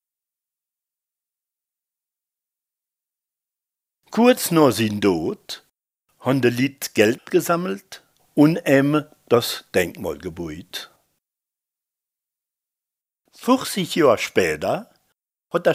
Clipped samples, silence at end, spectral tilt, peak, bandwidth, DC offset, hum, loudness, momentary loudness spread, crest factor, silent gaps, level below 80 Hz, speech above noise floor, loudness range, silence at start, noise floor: under 0.1%; 0 s; -5 dB/octave; 0 dBFS; 16 kHz; under 0.1%; none; -20 LUFS; 15 LU; 22 dB; none; -60 dBFS; 70 dB; 10 LU; 4.1 s; -89 dBFS